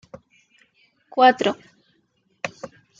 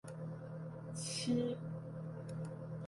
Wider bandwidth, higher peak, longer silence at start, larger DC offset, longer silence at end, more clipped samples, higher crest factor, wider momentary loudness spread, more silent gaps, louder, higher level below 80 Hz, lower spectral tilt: second, 7.6 kHz vs 11.5 kHz; first, -4 dBFS vs -26 dBFS; about the same, 0.15 s vs 0.05 s; neither; first, 0.35 s vs 0 s; neither; first, 22 dB vs 16 dB; first, 20 LU vs 10 LU; neither; first, -21 LUFS vs -42 LUFS; about the same, -70 dBFS vs -72 dBFS; second, -4 dB/octave vs -5.5 dB/octave